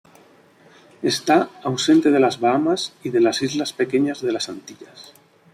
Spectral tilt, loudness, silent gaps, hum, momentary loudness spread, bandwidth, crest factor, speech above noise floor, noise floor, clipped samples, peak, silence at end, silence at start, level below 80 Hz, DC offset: -4.5 dB/octave; -20 LUFS; none; none; 10 LU; 14.5 kHz; 16 dB; 32 dB; -52 dBFS; under 0.1%; -4 dBFS; 0.5 s; 1 s; -66 dBFS; under 0.1%